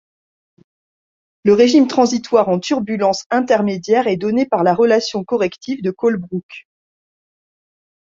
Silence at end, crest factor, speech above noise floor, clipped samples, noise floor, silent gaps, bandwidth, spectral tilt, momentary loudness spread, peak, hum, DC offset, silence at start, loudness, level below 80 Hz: 1.4 s; 16 dB; over 75 dB; under 0.1%; under -90 dBFS; 3.26-3.30 s, 6.43-6.49 s; 7.6 kHz; -5.5 dB/octave; 9 LU; 0 dBFS; none; under 0.1%; 1.45 s; -16 LUFS; -60 dBFS